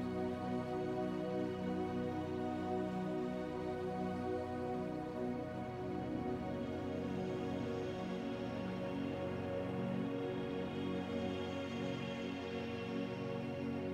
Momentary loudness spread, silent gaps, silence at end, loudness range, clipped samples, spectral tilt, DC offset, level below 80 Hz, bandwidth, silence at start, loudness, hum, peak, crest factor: 2 LU; none; 0 s; 1 LU; under 0.1%; -7.5 dB/octave; under 0.1%; -66 dBFS; 12.5 kHz; 0 s; -41 LUFS; none; -28 dBFS; 12 dB